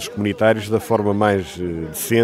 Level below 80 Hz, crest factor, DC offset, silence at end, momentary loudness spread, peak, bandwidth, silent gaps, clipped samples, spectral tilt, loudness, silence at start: -48 dBFS; 18 dB; under 0.1%; 0 s; 9 LU; -2 dBFS; 16 kHz; none; under 0.1%; -5.5 dB/octave; -20 LUFS; 0 s